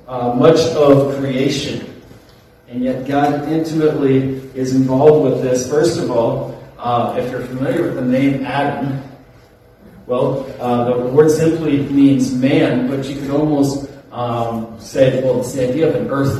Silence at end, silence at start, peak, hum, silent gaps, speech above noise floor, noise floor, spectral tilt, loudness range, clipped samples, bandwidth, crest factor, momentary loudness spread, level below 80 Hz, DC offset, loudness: 0 s; 0.05 s; 0 dBFS; none; none; 31 dB; -46 dBFS; -6.5 dB/octave; 5 LU; under 0.1%; 13.5 kHz; 16 dB; 12 LU; -48 dBFS; under 0.1%; -16 LUFS